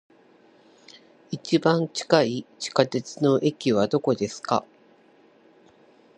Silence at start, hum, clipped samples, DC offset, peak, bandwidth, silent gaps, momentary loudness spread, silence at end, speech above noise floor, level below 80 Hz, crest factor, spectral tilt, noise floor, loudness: 1.3 s; none; under 0.1%; under 0.1%; -2 dBFS; 10.5 kHz; none; 6 LU; 1.55 s; 34 dB; -68 dBFS; 24 dB; -5.5 dB/octave; -57 dBFS; -24 LUFS